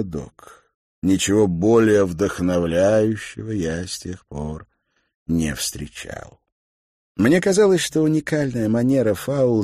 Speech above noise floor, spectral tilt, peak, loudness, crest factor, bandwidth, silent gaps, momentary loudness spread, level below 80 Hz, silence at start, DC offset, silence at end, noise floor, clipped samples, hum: over 71 dB; -5.5 dB/octave; -4 dBFS; -20 LUFS; 16 dB; 15 kHz; 0.74-1.02 s, 5.15-5.26 s, 6.52-7.15 s; 17 LU; -44 dBFS; 0 s; under 0.1%; 0 s; under -90 dBFS; under 0.1%; none